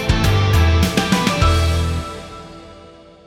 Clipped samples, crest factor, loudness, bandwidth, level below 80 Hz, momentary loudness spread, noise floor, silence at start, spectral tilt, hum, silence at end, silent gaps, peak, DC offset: under 0.1%; 16 dB; -16 LUFS; 16 kHz; -24 dBFS; 19 LU; -42 dBFS; 0 s; -5.5 dB/octave; none; 0.45 s; none; -2 dBFS; under 0.1%